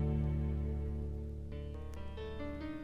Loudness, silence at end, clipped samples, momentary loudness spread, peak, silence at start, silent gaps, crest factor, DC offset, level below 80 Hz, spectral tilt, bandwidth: -41 LUFS; 0 s; under 0.1%; 10 LU; -24 dBFS; 0 s; none; 14 dB; under 0.1%; -42 dBFS; -9 dB/octave; 5.4 kHz